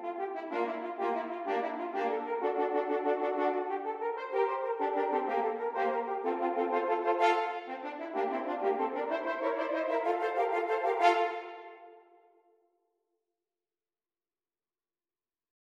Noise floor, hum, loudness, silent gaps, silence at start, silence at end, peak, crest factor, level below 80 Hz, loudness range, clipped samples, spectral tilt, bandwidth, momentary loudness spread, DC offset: under -90 dBFS; none; -32 LUFS; none; 0 s; 3.75 s; -12 dBFS; 20 dB; -86 dBFS; 2 LU; under 0.1%; -4 dB/octave; 9.6 kHz; 8 LU; under 0.1%